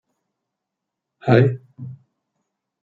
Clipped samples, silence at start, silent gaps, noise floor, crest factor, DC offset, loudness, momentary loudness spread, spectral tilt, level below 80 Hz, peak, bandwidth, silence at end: under 0.1%; 1.25 s; none; -82 dBFS; 22 dB; under 0.1%; -18 LUFS; 22 LU; -9.5 dB/octave; -64 dBFS; 0 dBFS; 4.6 kHz; 0.9 s